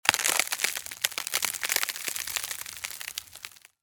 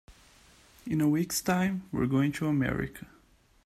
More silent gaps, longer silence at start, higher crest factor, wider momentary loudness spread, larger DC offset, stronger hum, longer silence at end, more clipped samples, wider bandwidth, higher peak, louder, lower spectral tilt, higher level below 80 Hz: neither; about the same, 0.05 s vs 0.1 s; first, 30 dB vs 16 dB; first, 13 LU vs 10 LU; neither; neither; second, 0.3 s vs 0.6 s; neither; first, 19 kHz vs 15.5 kHz; first, 0 dBFS vs -14 dBFS; about the same, -28 LUFS vs -29 LUFS; second, 1.5 dB/octave vs -5.5 dB/octave; second, -66 dBFS vs -54 dBFS